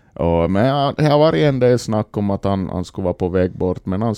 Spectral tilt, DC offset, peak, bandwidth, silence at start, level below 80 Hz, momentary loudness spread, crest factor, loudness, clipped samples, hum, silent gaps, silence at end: -7.5 dB/octave; under 0.1%; 0 dBFS; 12.5 kHz; 0.2 s; -40 dBFS; 8 LU; 16 dB; -18 LUFS; under 0.1%; none; none; 0 s